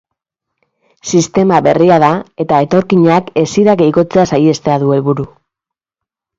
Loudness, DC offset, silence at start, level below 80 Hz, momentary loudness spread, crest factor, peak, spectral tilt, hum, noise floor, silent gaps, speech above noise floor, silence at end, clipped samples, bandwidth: -11 LUFS; under 0.1%; 1.05 s; -48 dBFS; 7 LU; 12 dB; 0 dBFS; -6.5 dB/octave; none; -83 dBFS; none; 73 dB; 1.1 s; under 0.1%; 7.8 kHz